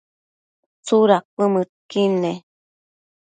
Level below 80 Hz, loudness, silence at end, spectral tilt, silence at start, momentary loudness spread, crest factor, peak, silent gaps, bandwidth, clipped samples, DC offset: -72 dBFS; -19 LUFS; 0.85 s; -6 dB/octave; 0.85 s; 12 LU; 20 dB; -2 dBFS; 1.25-1.37 s, 1.69-1.89 s; 9.2 kHz; under 0.1%; under 0.1%